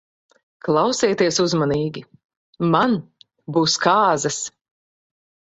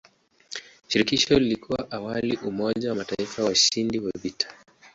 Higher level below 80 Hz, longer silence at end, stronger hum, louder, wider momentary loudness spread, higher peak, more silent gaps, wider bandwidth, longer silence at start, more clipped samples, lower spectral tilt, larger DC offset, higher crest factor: about the same, -58 dBFS vs -54 dBFS; first, 1 s vs 0.05 s; neither; first, -19 LUFS vs -24 LUFS; about the same, 11 LU vs 12 LU; first, -2 dBFS vs -6 dBFS; first, 2.24-2.29 s, 2.37-2.53 s vs none; about the same, 8.2 kHz vs 8 kHz; first, 0.65 s vs 0.5 s; neither; about the same, -4 dB/octave vs -3 dB/octave; neither; about the same, 20 dB vs 20 dB